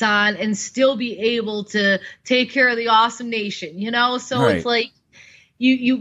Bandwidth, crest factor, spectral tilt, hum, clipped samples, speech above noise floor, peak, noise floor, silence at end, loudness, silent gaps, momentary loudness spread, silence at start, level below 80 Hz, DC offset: 9.4 kHz; 16 dB; -4 dB/octave; none; under 0.1%; 30 dB; -4 dBFS; -49 dBFS; 0 s; -19 LUFS; none; 8 LU; 0 s; -60 dBFS; under 0.1%